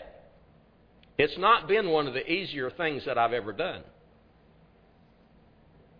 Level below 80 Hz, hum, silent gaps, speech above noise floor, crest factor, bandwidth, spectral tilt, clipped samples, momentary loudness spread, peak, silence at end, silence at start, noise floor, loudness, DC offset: -60 dBFS; none; none; 32 dB; 24 dB; 5.2 kHz; -7 dB/octave; under 0.1%; 11 LU; -6 dBFS; 2.15 s; 0 s; -60 dBFS; -27 LUFS; under 0.1%